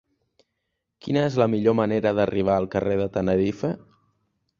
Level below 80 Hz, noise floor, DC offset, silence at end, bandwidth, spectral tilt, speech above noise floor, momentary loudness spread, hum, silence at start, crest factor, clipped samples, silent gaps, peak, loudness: -52 dBFS; -79 dBFS; under 0.1%; 0.8 s; 7.4 kHz; -8 dB/octave; 57 dB; 9 LU; none; 1.05 s; 18 dB; under 0.1%; none; -6 dBFS; -23 LUFS